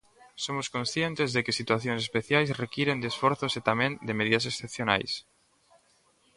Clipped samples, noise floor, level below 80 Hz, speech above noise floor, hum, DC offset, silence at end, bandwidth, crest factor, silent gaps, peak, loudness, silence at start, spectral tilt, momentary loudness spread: under 0.1%; -66 dBFS; -64 dBFS; 37 dB; none; under 0.1%; 1.15 s; 11.5 kHz; 24 dB; none; -6 dBFS; -28 LUFS; 0.25 s; -4.5 dB/octave; 6 LU